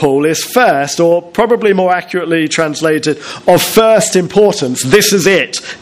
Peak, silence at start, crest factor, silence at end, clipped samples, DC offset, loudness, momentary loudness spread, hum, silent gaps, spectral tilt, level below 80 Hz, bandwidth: 0 dBFS; 0 s; 10 dB; 0.05 s; 0.5%; under 0.1%; -11 LUFS; 7 LU; none; none; -4 dB/octave; -46 dBFS; 16 kHz